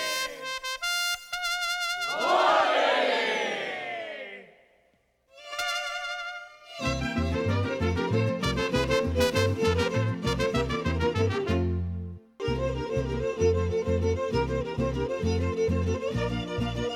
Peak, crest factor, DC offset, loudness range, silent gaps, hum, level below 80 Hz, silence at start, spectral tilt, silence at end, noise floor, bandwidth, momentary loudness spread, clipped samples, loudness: -12 dBFS; 14 dB; under 0.1%; 6 LU; none; none; -42 dBFS; 0 s; -5 dB/octave; 0 s; -68 dBFS; 17.5 kHz; 10 LU; under 0.1%; -27 LUFS